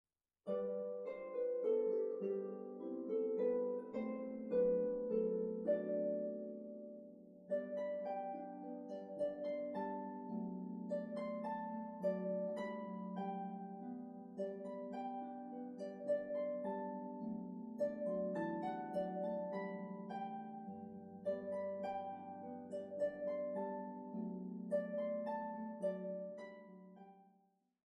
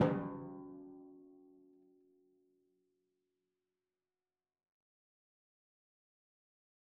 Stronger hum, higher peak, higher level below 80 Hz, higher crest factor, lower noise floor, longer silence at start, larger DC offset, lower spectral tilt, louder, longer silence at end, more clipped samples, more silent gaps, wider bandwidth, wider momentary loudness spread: neither; second, -26 dBFS vs -16 dBFS; about the same, -82 dBFS vs -78 dBFS; second, 18 dB vs 30 dB; second, -77 dBFS vs under -90 dBFS; first, 0.45 s vs 0 s; neither; first, -9 dB/octave vs -6 dB/octave; about the same, -43 LUFS vs -43 LUFS; second, 0.7 s vs 5.4 s; neither; neither; first, 9.6 kHz vs 3.5 kHz; second, 11 LU vs 24 LU